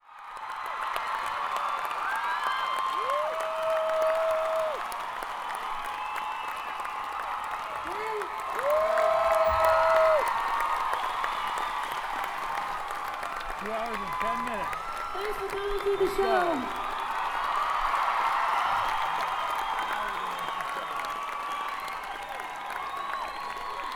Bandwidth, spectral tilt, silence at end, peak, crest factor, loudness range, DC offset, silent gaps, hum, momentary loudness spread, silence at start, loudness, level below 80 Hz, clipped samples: over 20 kHz; -3 dB/octave; 0 s; -10 dBFS; 18 dB; 8 LU; under 0.1%; none; none; 10 LU; 0.1 s; -29 LUFS; -52 dBFS; under 0.1%